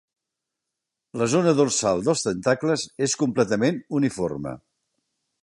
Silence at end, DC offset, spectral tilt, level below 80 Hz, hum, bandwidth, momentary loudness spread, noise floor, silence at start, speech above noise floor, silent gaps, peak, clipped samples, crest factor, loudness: 0.85 s; under 0.1%; -4.5 dB/octave; -58 dBFS; none; 11.5 kHz; 10 LU; -84 dBFS; 1.15 s; 62 dB; none; -6 dBFS; under 0.1%; 18 dB; -23 LUFS